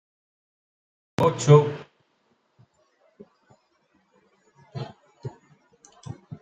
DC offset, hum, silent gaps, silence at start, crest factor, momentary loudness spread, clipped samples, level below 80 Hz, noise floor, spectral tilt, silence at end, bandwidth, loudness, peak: under 0.1%; none; none; 1.2 s; 24 dB; 25 LU; under 0.1%; -62 dBFS; -69 dBFS; -7 dB/octave; 0.05 s; 9 kHz; -20 LUFS; -4 dBFS